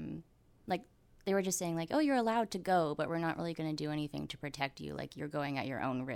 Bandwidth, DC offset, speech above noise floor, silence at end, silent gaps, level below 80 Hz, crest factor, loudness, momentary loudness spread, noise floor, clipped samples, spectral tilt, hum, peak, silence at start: 17 kHz; under 0.1%; 22 dB; 0 s; none; -66 dBFS; 18 dB; -36 LUFS; 11 LU; -57 dBFS; under 0.1%; -5 dB/octave; none; -18 dBFS; 0 s